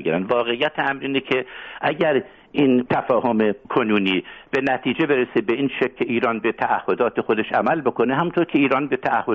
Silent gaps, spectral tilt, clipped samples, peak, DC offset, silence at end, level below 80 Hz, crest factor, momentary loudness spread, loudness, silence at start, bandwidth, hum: none; -3.5 dB/octave; under 0.1%; -4 dBFS; under 0.1%; 0 s; -58 dBFS; 16 dB; 5 LU; -21 LUFS; 0 s; 6.8 kHz; none